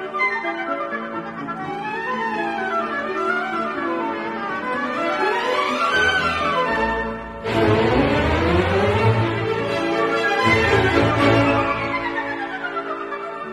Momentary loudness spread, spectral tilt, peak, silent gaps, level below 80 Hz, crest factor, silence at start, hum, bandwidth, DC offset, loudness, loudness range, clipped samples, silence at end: 10 LU; -6 dB/octave; -4 dBFS; none; -40 dBFS; 16 dB; 0 s; none; 13 kHz; under 0.1%; -20 LUFS; 6 LU; under 0.1%; 0 s